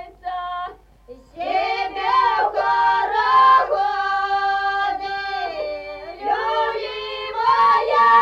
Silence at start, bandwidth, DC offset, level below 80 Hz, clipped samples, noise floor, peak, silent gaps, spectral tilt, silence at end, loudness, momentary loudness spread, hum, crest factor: 0 s; 7.6 kHz; under 0.1%; -52 dBFS; under 0.1%; -44 dBFS; -4 dBFS; none; -3 dB/octave; 0 s; -19 LUFS; 15 LU; none; 16 dB